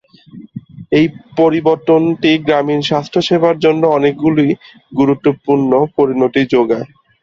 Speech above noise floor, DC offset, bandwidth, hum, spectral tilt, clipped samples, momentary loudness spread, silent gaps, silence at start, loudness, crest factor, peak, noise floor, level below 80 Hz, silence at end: 24 dB; under 0.1%; 7.4 kHz; none; -7 dB/octave; under 0.1%; 9 LU; none; 0.35 s; -13 LUFS; 12 dB; 0 dBFS; -37 dBFS; -52 dBFS; 0.35 s